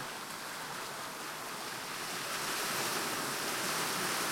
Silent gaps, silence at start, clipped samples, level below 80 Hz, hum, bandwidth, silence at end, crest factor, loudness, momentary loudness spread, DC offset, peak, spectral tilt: none; 0 s; under 0.1%; -74 dBFS; none; 16.5 kHz; 0 s; 16 dB; -36 LUFS; 8 LU; under 0.1%; -22 dBFS; -1 dB/octave